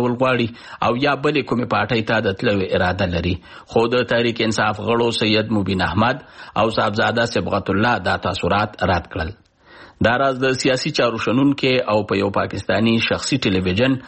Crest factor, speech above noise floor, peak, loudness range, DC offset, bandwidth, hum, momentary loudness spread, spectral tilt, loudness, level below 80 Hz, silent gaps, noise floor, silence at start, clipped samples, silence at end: 16 dB; 26 dB; -2 dBFS; 2 LU; under 0.1%; 8.8 kHz; none; 4 LU; -5.5 dB/octave; -19 LUFS; -44 dBFS; none; -45 dBFS; 0 s; under 0.1%; 0 s